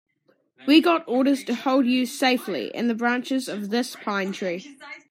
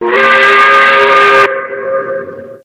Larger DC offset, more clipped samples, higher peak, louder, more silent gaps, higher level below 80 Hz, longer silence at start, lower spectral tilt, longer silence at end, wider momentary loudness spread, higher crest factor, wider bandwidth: neither; second, under 0.1% vs 2%; second, -4 dBFS vs 0 dBFS; second, -23 LUFS vs -7 LUFS; neither; second, -78 dBFS vs -52 dBFS; first, 0.6 s vs 0 s; about the same, -4 dB/octave vs -3 dB/octave; about the same, 0.1 s vs 0.1 s; about the same, 12 LU vs 14 LU; first, 18 dB vs 8 dB; about the same, 16 kHz vs 15.5 kHz